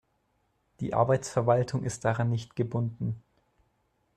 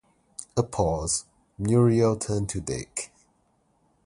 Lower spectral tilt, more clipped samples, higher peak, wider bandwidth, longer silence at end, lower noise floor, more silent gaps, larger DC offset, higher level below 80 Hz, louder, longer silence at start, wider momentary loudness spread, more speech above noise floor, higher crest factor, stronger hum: about the same, -6.5 dB/octave vs -6 dB/octave; neither; about the same, -10 dBFS vs -8 dBFS; about the same, 10.5 kHz vs 11.5 kHz; about the same, 1 s vs 1 s; first, -73 dBFS vs -68 dBFS; neither; neither; second, -60 dBFS vs -46 dBFS; second, -29 LUFS vs -26 LUFS; first, 0.8 s vs 0.4 s; second, 10 LU vs 14 LU; about the same, 46 dB vs 43 dB; about the same, 20 dB vs 20 dB; neither